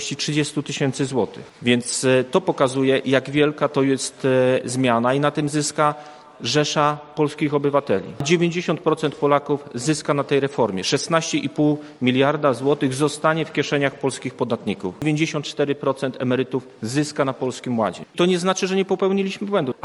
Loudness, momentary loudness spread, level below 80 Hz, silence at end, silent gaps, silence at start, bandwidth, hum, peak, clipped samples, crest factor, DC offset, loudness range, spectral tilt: -21 LUFS; 6 LU; -62 dBFS; 0.15 s; none; 0 s; 12 kHz; none; -2 dBFS; under 0.1%; 20 dB; under 0.1%; 4 LU; -5 dB/octave